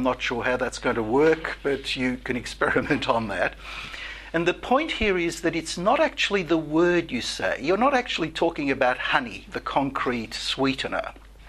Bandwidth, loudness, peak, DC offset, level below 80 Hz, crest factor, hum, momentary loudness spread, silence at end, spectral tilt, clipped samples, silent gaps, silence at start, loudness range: 13 kHz; -24 LUFS; -4 dBFS; under 0.1%; -46 dBFS; 22 dB; none; 8 LU; 0 s; -4.5 dB/octave; under 0.1%; none; 0 s; 2 LU